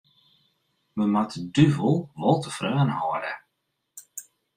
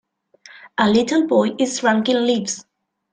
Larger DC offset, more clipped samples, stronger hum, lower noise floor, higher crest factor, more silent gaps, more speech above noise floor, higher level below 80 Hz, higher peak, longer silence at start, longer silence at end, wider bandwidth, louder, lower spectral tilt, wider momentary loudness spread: neither; neither; neither; first, -78 dBFS vs -49 dBFS; first, 22 dB vs 16 dB; neither; first, 55 dB vs 31 dB; about the same, -60 dBFS vs -60 dBFS; about the same, -4 dBFS vs -2 dBFS; first, 0.95 s vs 0.65 s; second, 0.35 s vs 0.5 s; first, 15.5 kHz vs 9.6 kHz; second, -24 LUFS vs -18 LUFS; first, -6.5 dB/octave vs -4 dB/octave; first, 19 LU vs 10 LU